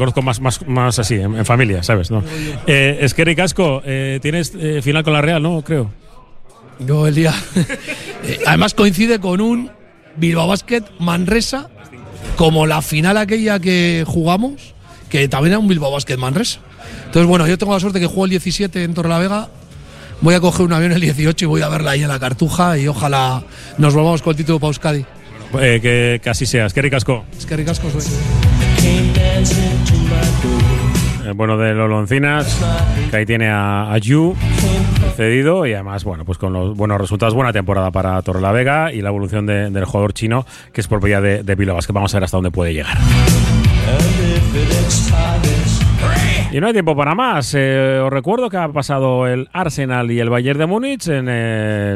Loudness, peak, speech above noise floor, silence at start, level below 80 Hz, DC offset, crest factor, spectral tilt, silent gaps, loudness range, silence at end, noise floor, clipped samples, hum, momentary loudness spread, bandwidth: -15 LUFS; 0 dBFS; 22 dB; 0 s; -26 dBFS; under 0.1%; 14 dB; -5.5 dB/octave; none; 3 LU; 0 s; -36 dBFS; under 0.1%; none; 7 LU; 15 kHz